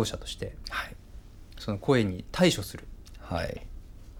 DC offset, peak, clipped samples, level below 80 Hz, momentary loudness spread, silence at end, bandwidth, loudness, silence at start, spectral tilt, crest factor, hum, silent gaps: under 0.1%; -10 dBFS; under 0.1%; -46 dBFS; 25 LU; 0 s; 18.5 kHz; -30 LUFS; 0 s; -5 dB/octave; 22 dB; none; none